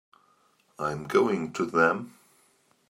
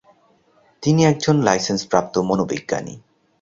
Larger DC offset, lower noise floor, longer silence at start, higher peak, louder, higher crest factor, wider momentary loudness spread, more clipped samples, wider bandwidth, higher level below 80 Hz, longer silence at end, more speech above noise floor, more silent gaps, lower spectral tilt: neither; first, -66 dBFS vs -58 dBFS; about the same, 0.8 s vs 0.8 s; second, -8 dBFS vs -2 dBFS; second, -27 LUFS vs -19 LUFS; about the same, 22 dB vs 20 dB; about the same, 10 LU vs 10 LU; neither; first, 15.5 kHz vs 7.8 kHz; second, -68 dBFS vs -54 dBFS; first, 0.8 s vs 0.45 s; about the same, 40 dB vs 39 dB; neither; about the same, -6 dB/octave vs -5.5 dB/octave